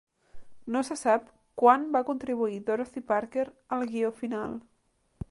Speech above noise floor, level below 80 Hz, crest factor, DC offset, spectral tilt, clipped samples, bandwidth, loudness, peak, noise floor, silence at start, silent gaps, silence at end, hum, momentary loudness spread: 43 dB; -58 dBFS; 22 dB; under 0.1%; -5.5 dB/octave; under 0.1%; 11.5 kHz; -28 LUFS; -6 dBFS; -70 dBFS; 0.35 s; none; 0.05 s; none; 15 LU